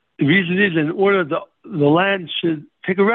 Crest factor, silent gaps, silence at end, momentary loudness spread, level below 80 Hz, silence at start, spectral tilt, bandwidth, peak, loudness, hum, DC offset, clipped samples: 14 dB; none; 0 s; 9 LU; -62 dBFS; 0.2 s; -9.5 dB/octave; 4.2 kHz; -4 dBFS; -18 LUFS; none; under 0.1%; under 0.1%